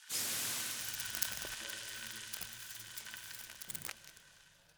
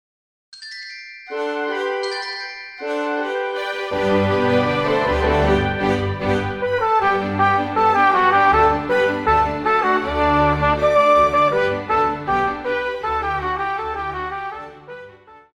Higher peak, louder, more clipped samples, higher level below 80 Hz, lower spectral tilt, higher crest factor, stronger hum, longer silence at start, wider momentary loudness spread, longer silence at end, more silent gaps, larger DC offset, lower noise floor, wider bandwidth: second, -10 dBFS vs -4 dBFS; second, -40 LUFS vs -19 LUFS; neither; second, -70 dBFS vs -38 dBFS; second, 0.5 dB/octave vs -6 dB/octave; first, 34 dB vs 16 dB; neither; second, 0 s vs 0.55 s; second, 11 LU vs 16 LU; about the same, 0.05 s vs 0.15 s; neither; neither; first, -64 dBFS vs -44 dBFS; first, over 20 kHz vs 12.5 kHz